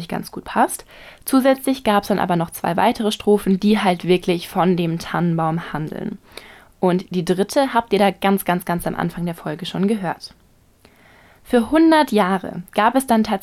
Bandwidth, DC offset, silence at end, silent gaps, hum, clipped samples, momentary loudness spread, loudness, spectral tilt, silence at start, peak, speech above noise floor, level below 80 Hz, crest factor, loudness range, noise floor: 16 kHz; under 0.1%; 0 s; none; none; under 0.1%; 11 LU; -19 LUFS; -6 dB/octave; 0 s; -4 dBFS; 34 dB; -50 dBFS; 16 dB; 4 LU; -53 dBFS